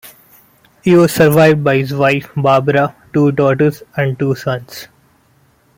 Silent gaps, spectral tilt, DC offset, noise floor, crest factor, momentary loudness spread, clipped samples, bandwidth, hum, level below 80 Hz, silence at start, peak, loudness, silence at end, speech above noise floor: none; -6.5 dB/octave; under 0.1%; -53 dBFS; 14 dB; 11 LU; under 0.1%; 17 kHz; none; -50 dBFS; 0.05 s; 0 dBFS; -13 LUFS; 0.9 s; 41 dB